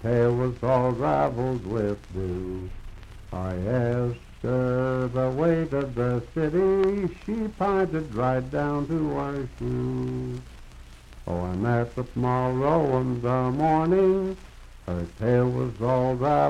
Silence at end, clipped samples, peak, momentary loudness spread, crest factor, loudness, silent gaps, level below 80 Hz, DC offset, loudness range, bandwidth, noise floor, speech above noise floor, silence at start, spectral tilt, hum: 0 s; under 0.1%; -10 dBFS; 10 LU; 16 dB; -26 LUFS; none; -44 dBFS; under 0.1%; 5 LU; 10 kHz; -45 dBFS; 20 dB; 0 s; -9 dB/octave; none